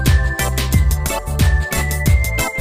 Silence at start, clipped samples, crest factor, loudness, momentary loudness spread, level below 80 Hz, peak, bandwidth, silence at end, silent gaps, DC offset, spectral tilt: 0 s; under 0.1%; 12 dB; -17 LUFS; 3 LU; -18 dBFS; -2 dBFS; 15.5 kHz; 0 s; none; 0.8%; -4.5 dB/octave